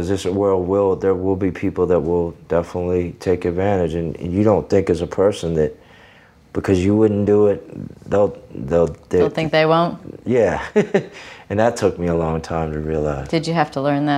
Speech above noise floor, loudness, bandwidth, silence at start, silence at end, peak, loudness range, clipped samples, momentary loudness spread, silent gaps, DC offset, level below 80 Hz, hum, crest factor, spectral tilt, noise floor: 30 dB; -19 LUFS; 12 kHz; 0 s; 0 s; -2 dBFS; 2 LU; under 0.1%; 7 LU; none; under 0.1%; -44 dBFS; none; 18 dB; -7 dB/octave; -48 dBFS